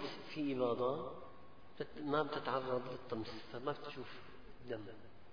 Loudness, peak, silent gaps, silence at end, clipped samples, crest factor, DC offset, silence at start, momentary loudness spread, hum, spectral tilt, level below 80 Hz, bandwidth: -42 LUFS; -22 dBFS; none; 0 s; under 0.1%; 20 dB; 0.3%; 0 s; 20 LU; none; -4.5 dB/octave; -70 dBFS; 5.2 kHz